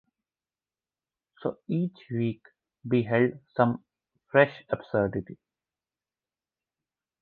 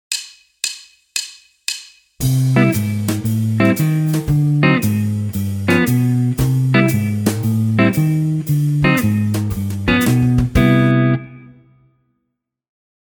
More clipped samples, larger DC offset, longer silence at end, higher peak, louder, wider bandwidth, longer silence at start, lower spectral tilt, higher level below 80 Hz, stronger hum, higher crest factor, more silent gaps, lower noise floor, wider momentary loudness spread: neither; neither; first, 1.85 s vs 1.65 s; second, -6 dBFS vs -2 dBFS; second, -28 LUFS vs -16 LUFS; second, 4.6 kHz vs over 20 kHz; first, 1.4 s vs 0.1 s; first, -10 dB/octave vs -6 dB/octave; second, -62 dBFS vs -36 dBFS; neither; first, 24 dB vs 16 dB; neither; first, under -90 dBFS vs -75 dBFS; first, 14 LU vs 10 LU